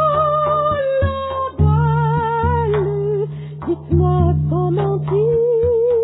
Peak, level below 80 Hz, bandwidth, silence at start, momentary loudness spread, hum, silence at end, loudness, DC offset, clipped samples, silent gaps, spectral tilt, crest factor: -4 dBFS; -32 dBFS; 4 kHz; 0 s; 7 LU; none; 0 s; -17 LUFS; under 0.1%; under 0.1%; none; -12.5 dB/octave; 12 dB